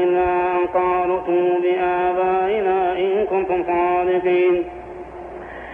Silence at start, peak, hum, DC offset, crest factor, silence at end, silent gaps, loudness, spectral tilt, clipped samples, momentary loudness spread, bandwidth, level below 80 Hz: 0 s; -8 dBFS; none; under 0.1%; 12 dB; 0 s; none; -19 LUFS; -8 dB/octave; under 0.1%; 16 LU; 3.7 kHz; -48 dBFS